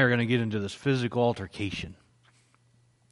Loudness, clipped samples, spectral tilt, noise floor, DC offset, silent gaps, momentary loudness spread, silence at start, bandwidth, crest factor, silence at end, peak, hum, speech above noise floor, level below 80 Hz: -28 LUFS; under 0.1%; -6.5 dB/octave; -65 dBFS; under 0.1%; none; 9 LU; 0 s; 11.5 kHz; 20 dB; 1.2 s; -10 dBFS; none; 37 dB; -60 dBFS